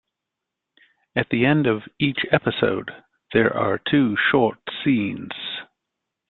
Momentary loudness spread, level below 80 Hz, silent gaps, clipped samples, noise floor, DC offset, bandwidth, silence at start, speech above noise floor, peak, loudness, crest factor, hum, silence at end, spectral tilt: 11 LU; -56 dBFS; none; under 0.1%; -84 dBFS; under 0.1%; 4.3 kHz; 1.15 s; 63 dB; -2 dBFS; -21 LUFS; 20 dB; none; 0.65 s; -10.5 dB/octave